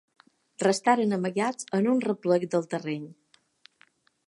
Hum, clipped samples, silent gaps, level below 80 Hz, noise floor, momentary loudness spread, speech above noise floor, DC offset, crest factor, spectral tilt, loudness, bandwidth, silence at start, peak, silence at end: none; under 0.1%; none; -80 dBFS; -64 dBFS; 10 LU; 38 dB; under 0.1%; 20 dB; -5.5 dB/octave; -26 LUFS; 11.5 kHz; 0.6 s; -8 dBFS; 1.15 s